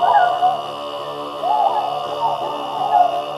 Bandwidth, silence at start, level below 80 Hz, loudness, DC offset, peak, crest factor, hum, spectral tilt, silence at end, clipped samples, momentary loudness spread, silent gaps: 13 kHz; 0 s; -64 dBFS; -19 LUFS; under 0.1%; -4 dBFS; 16 dB; none; -4 dB/octave; 0 s; under 0.1%; 12 LU; none